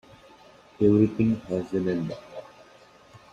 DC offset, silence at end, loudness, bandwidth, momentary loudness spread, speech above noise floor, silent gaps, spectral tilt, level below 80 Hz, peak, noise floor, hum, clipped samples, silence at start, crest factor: under 0.1%; 0.15 s; -25 LUFS; 7.6 kHz; 20 LU; 30 dB; none; -9 dB/octave; -56 dBFS; -8 dBFS; -53 dBFS; none; under 0.1%; 0.8 s; 18 dB